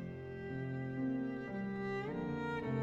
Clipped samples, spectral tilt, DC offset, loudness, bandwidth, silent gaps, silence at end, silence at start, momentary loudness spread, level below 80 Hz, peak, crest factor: under 0.1%; -8.5 dB/octave; under 0.1%; -41 LUFS; 7.6 kHz; none; 0 s; 0 s; 5 LU; -66 dBFS; -28 dBFS; 12 dB